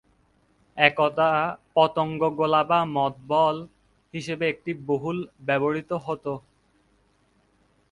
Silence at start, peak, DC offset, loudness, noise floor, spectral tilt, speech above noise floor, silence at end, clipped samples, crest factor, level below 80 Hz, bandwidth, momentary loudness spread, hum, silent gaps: 0.75 s; 0 dBFS; under 0.1%; -24 LUFS; -65 dBFS; -6 dB/octave; 41 dB; 1.5 s; under 0.1%; 24 dB; -64 dBFS; 11 kHz; 12 LU; none; none